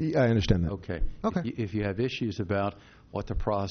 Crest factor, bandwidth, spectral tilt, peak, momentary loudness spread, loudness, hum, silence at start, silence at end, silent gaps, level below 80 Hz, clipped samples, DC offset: 18 dB; 6.6 kHz; -6.5 dB/octave; -10 dBFS; 10 LU; -30 LUFS; none; 0 s; 0 s; none; -38 dBFS; under 0.1%; under 0.1%